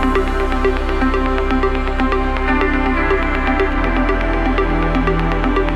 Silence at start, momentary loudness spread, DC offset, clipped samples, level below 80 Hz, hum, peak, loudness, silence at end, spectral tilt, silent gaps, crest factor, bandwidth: 0 s; 2 LU; under 0.1%; under 0.1%; -20 dBFS; none; -2 dBFS; -17 LUFS; 0 s; -7 dB/octave; none; 14 dB; 8.4 kHz